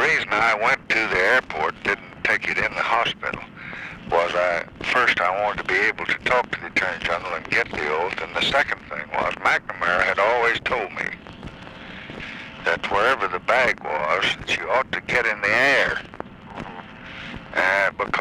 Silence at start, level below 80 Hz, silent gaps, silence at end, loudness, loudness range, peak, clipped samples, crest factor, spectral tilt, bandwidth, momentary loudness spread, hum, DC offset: 0 s; -50 dBFS; none; 0 s; -21 LUFS; 3 LU; -8 dBFS; under 0.1%; 16 dB; -3.5 dB/octave; 15.5 kHz; 17 LU; none; under 0.1%